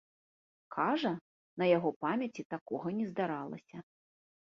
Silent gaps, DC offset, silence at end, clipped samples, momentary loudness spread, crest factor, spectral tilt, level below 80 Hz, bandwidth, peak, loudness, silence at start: 1.21-1.57 s, 1.96-2.01 s, 2.45-2.50 s, 2.61-2.66 s; under 0.1%; 0.6 s; under 0.1%; 17 LU; 20 dB; -5 dB/octave; -78 dBFS; 7.2 kHz; -14 dBFS; -35 LUFS; 0.7 s